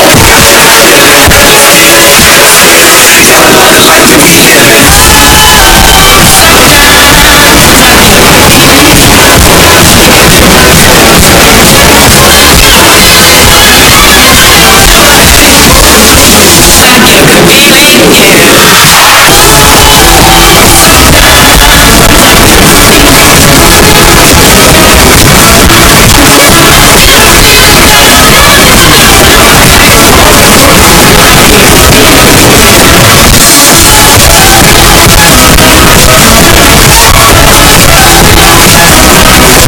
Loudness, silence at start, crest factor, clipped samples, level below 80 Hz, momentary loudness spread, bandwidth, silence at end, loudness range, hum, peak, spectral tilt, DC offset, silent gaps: 1 LUFS; 0 s; 0 dB; 100%; -12 dBFS; 1 LU; 16 kHz; 0 s; 1 LU; none; 0 dBFS; -2.5 dB/octave; under 0.1%; none